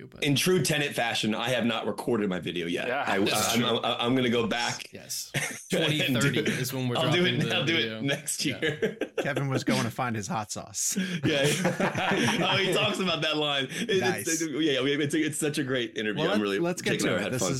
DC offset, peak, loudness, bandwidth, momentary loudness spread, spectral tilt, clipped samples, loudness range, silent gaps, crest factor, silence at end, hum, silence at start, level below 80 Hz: under 0.1%; -12 dBFS; -27 LUFS; 16.5 kHz; 6 LU; -4 dB/octave; under 0.1%; 2 LU; none; 14 dB; 0 s; none; 0 s; -64 dBFS